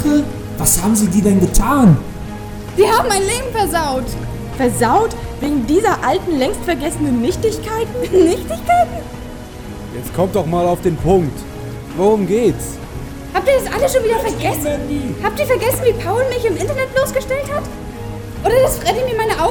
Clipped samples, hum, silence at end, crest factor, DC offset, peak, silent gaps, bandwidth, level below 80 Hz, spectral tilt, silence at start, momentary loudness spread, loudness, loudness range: under 0.1%; none; 0 s; 16 dB; under 0.1%; 0 dBFS; none; over 20 kHz; -30 dBFS; -5 dB/octave; 0 s; 15 LU; -16 LUFS; 3 LU